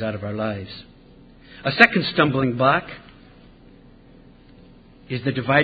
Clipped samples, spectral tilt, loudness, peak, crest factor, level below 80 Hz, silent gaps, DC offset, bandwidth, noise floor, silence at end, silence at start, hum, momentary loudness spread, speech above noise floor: under 0.1%; -7.5 dB/octave; -20 LUFS; 0 dBFS; 24 dB; -52 dBFS; none; under 0.1%; 8 kHz; -48 dBFS; 0 s; 0 s; 60 Hz at -45 dBFS; 23 LU; 28 dB